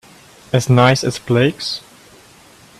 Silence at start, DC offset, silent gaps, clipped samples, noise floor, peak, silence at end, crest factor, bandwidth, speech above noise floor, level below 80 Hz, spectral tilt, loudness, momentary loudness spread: 0.55 s; under 0.1%; none; under 0.1%; -45 dBFS; 0 dBFS; 1 s; 18 dB; 13.5 kHz; 31 dB; -50 dBFS; -5.5 dB/octave; -16 LUFS; 12 LU